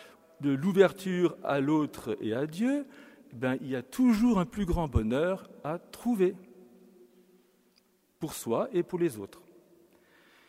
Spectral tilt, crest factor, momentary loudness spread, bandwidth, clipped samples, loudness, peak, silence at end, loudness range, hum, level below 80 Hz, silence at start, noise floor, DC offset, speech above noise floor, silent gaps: -7 dB/octave; 22 dB; 13 LU; 16 kHz; under 0.1%; -30 LUFS; -8 dBFS; 1.25 s; 7 LU; none; -46 dBFS; 0 s; -68 dBFS; under 0.1%; 39 dB; none